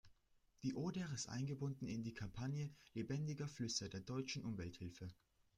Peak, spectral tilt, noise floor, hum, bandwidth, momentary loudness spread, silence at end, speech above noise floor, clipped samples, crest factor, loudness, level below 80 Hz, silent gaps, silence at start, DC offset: -28 dBFS; -5 dB/octave; -76 dBFS; none; 11.5 kHz; 7 LU; 0.45 s; 30 dB; under 0.1%; 18 dB; -47 LUFS; -70 dBFS; none; 0.05 s; under 0.1%